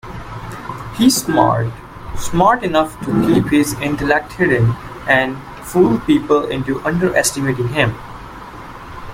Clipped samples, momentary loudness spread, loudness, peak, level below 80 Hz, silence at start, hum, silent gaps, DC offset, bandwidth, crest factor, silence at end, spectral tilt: under 0.1%; 18 LU; -16 LUFS; 0 dBFS; -38 dBFS; 0.05 s; none; none; under 0.1%; 16.5 kHz; 16 dB; 0 s; -5 dB/octave